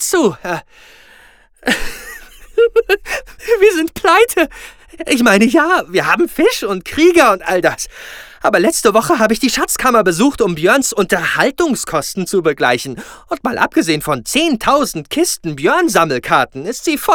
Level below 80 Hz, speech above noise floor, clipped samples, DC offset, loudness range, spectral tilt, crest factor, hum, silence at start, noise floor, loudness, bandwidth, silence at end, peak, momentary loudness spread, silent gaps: -42 dBFS; 32 dB; under 0.1%; under 0.1%; 3 LU; -3.5 dB/octave; 14 dB; none; 0 s; -46 dBFS; -14 LUFS; over 20 kHz; 0 s; 0 dBFS; 12 LU; none